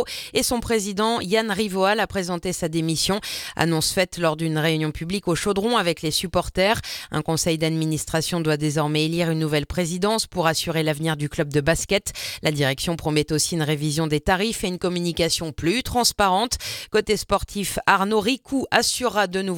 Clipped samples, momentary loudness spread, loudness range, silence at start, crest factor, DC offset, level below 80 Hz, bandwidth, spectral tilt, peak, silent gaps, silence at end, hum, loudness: under 0.1%; 5 LU; 1 LU; 0 s; 22 dB; under 0.1%; -44 dBFS; 18.5 kHz; -4 dB/octave; 0 dBFS; none; 0 s; none; -22 LUFS